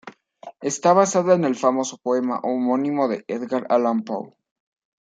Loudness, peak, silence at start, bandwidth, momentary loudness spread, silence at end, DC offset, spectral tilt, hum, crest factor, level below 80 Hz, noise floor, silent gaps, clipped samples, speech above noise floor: -21 LUFS; -4 dBFS; 0.05 s; 9.4 kHz; 11 LU; 0.8 s; under 0.1%; -5.5 dB/octave; none; 18 dB; -74 dBFS; -44 dBFS; none; under 0.1%; 23 dB